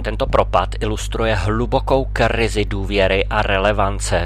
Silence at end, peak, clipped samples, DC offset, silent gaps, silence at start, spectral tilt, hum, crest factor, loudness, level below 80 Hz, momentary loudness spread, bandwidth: 0 s; -2 dBFS; under 0.1%; 0.2%; none; 0 s; -5 dB/octave; none; 16 dB; -18 LUFS; -24 dBFS; 5 LU; 13 kHz